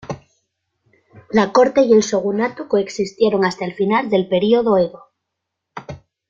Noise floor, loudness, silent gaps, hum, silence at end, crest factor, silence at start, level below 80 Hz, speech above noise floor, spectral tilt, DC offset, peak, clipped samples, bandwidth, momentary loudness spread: -79 dBFS; -17 LUFS; none; none; 0.35 s; 16 dB; 0.05 s; -56 dBFS; 63 dB; -5.5 dB/octave; under 0.1%; -2 dBFS; under 0.1%; 7.6 kHz; 20 LU